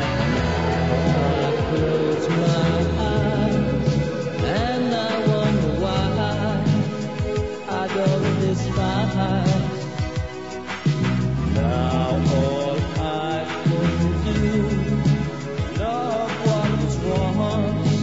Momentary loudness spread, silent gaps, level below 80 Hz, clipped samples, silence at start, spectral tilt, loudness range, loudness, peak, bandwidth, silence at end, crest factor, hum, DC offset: 5 LU; none; -34 dBFS; under 0.1%; 0 s; -7 dB/octave; 2 LU; -22 LUFS; -8 dBFS; 8 kHz; 0 s; 14 dB; none; 0.5%